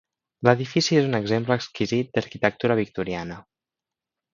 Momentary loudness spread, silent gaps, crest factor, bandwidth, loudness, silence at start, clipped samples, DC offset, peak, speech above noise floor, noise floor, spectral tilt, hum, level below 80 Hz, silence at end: 9 LU; none; 24 dB; 7.6 kHz; -23 LUFS; 0.4 s; under 0.1%; under 0.1%; 0 dBFS; 66 dB; -89 dBFS; -5.5 dB/octave; none; -58 dBFS; 0.95 s